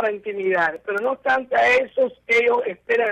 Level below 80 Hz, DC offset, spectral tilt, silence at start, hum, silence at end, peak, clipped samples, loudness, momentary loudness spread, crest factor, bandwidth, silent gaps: -60 dBFS; under 0.1%; -4 dB/octave; 0 s; none; 0 s; -10 dBFS; under 0.1%; -20 LUFS; 7 LU; 10 dB; 9.4 kHz; none